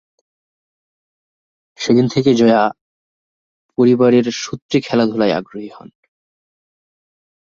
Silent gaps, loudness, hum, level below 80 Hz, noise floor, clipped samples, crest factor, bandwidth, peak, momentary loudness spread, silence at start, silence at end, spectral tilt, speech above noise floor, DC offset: 2.81-3.69 s, 4.62-4.69 s; -15 LUFS; none; -58 dBFS; under -90 dBFS; under 0.1%; 16 dB; 7.4 kHz; -2 dBFS; 15 LU; 1.8 s; 1.8 s; -6 dB/octave; over 76 dB; under 0.1%